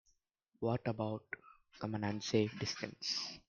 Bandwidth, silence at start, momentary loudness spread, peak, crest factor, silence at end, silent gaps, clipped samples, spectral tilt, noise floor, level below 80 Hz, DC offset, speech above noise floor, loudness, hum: 7.4 kHz; 0.6 s; 11 LU; -18 dBFS; 22 dB; 0.1 s; none; under 0.1%; -5 dB/octave; -78 dBFS; -72 dBFS; under 0.1%; 40 dB; -39 LUFS; none